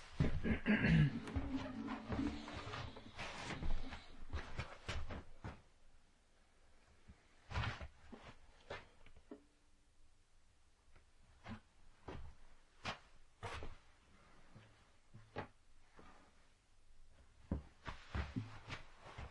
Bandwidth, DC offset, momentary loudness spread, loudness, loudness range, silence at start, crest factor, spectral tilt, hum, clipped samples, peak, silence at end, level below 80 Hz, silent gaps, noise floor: 11 kHz; under 0.1%; 23 LU; -44 LUFS; 19 LU; 0 s; 22 dB; -6.5 dB/octave; none; under 0.1%; -22 dBFS; 0 s; -52 dBFS; none; -70 dBFS